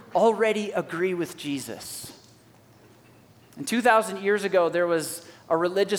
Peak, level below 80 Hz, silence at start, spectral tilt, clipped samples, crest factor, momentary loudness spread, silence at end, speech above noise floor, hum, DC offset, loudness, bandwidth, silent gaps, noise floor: -6 dBFS; -72 dBFS; 0.1 s; -4 dB/octave; under 0.1%; 20 dB; 15 LU; 0 s; 30 dB; none; under 0.1%; -25 LUFS; 18.5 kHz; none; -55 dBFS